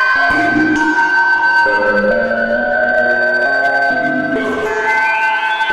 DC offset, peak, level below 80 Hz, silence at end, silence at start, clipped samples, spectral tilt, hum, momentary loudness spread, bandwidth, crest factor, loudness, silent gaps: under 0.1%; -4 dBFS; -44 dBFS; 0 s; 0 s; under 0.1%; -4.5 dB/octave; none; 5 LU; 12 kHz; 10 dB; -13 LUFS; none